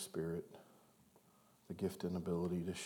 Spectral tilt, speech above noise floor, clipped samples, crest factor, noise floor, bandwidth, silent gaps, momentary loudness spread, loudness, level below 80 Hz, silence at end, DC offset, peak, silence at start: -6 dB/octave; 28 dB; under 0.1%; 16 dB; -70 dBFS; 20 kHz; none; 16 LU; -43 LUFS; -76 dBFS; 0 s; under 0.1%; -28 dBFS; 0 s